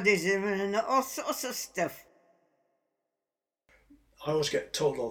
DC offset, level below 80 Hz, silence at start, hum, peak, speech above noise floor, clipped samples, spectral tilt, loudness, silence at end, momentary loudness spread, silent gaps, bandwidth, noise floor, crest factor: under 0.1%; -68 dBFS; 0 s; none; -12 dBFS; over 60 dB; under 0.1%; -3.5 dB/octave; -30 LUFS; 0 s; 7 LU; none; over 20 kHz; under -90 dBFS; 22 dB